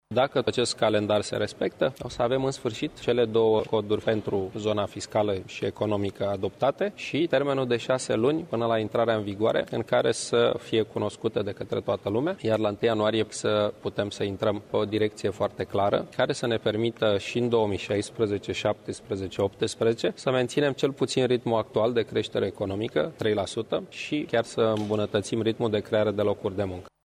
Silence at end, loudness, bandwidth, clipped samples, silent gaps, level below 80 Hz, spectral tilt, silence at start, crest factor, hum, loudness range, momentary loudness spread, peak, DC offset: 0.15 s; -27 LUFS; 13.5 kHz; under 0.1%; none; -60 dBFS; -5.5 dB/octave; 0.1 s; 16 dB; none; 2 LU; 6 LU; -10 dBFS; under 0.1%